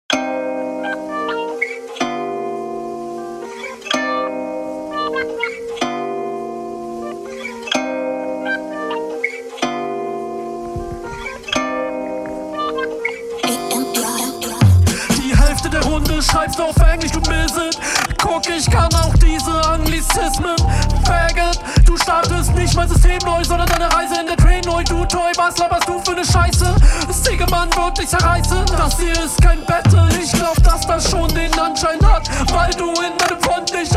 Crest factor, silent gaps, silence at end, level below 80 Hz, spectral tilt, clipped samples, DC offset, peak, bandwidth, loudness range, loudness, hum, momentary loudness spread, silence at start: 16 dB; none; 0 s; -20 dBFS; -4.5 dB/octave; under 0.1%; under 0.1%; 0 dBFS; 15.5 kHz; 8 LU; -17 LUFS; none; 11 LU; 0.1 s